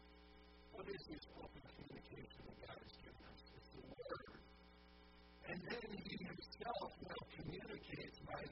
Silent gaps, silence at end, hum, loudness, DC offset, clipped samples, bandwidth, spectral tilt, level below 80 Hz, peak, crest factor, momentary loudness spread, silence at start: none; 0 s; none; -54 LUFS; under 0.1%; under 0.1%; 5.8 kHz; -4 dB/octave; -68 dBFS; -32 dBFS; 22 dB; 16 LU; 0 s